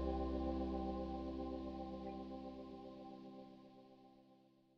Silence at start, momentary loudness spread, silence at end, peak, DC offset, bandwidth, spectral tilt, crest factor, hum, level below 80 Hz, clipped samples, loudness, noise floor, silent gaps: 0 s; 20 LU; 0.4 s; -28 dBFS; under 0.1%; 6.4 kHz; -9 dB/octave; 18 dB; none; -54 dBFS; under 0.1%; -46 LUFS; -70 dBFS; none